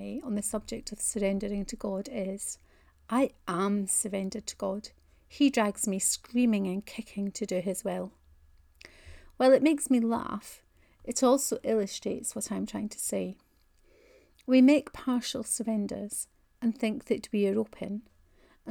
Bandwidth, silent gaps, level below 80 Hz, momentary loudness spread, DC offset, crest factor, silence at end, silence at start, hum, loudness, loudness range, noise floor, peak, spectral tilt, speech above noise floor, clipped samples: over 20 kHz; none; -58 dBFS; 14 LU; under 0.1%; 20 dB; 0 s; 0 s; none; -29 LUFS; 4 LU; -64 dBFS; -10 dBFS; -4.5 dB/octave; 35 dB; under 0.1%